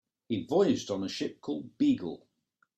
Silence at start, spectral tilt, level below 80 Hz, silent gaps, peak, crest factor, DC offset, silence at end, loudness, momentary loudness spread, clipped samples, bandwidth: 0.3 s; -6 dB/octave; -70 dBFS; none; -14 dBFS; 18 dB; under 0.1%; 0.6 s; -31 LUFS; 11 LU; under 0.1%; 8.8 kHz